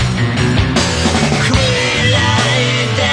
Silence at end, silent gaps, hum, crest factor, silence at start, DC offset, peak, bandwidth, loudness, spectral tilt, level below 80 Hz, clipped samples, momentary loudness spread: 0 s; none; none; 14 dB; 0 s; under 0.1%; 0 dBFS; 10.5 kHz; -13 LUFS; -4.5 dB/octave; -28 dBFS; under 0.1%; 2 LU